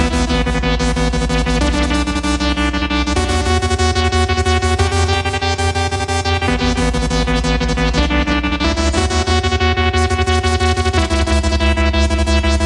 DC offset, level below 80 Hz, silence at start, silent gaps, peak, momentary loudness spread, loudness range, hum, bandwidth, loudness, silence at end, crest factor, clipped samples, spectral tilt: under 0.1%; -20 dBFS; 0 s; none; -2 dBFS; 2 LU; 1 LU; none; 11.5 kHz; -16 LUFS; 0 s; 14 dB; under 0.1%; -5 dB/octave